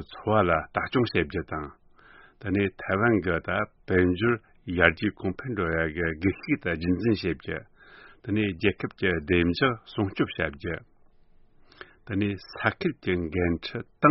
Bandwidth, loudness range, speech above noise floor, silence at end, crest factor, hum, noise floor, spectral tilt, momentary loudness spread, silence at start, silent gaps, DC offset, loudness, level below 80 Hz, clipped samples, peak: 5.8 kHz; 5 LU; 30 dB; 0 s; 26 dB; none; -56 dBFS; -5 dB/octave; 11 LU; 0 s; none; under 0.1%; -27 LUFS; -48 dBFS; under 0.1%; -2 dBFS